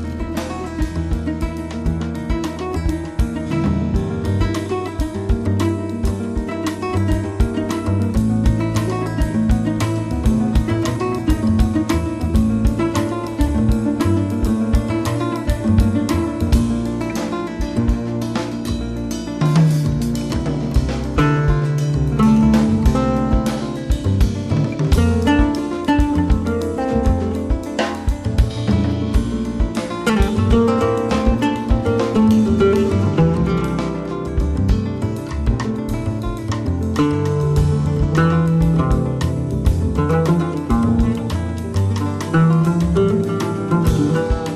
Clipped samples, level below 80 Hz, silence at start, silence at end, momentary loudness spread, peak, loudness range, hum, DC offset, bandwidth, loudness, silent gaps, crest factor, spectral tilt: under 0.1%; -24 dBFS; 0 s; 0 s; 8 LU; -4 dBFS; 4 LU; none; under 0.1%; 14 kHz; -19 LUFS; none; 14 dB; -7.5 dB/octave